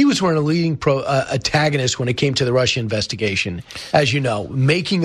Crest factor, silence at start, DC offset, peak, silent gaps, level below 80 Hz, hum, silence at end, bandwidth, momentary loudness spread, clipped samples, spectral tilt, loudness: 16 dB; 0 s; under 0.1%; -2 dBFS; none; -46 dBFS; none; 0 s; 13 kHz; 4 LU; under 0.1%; -5 dB/octave; -18 LUFS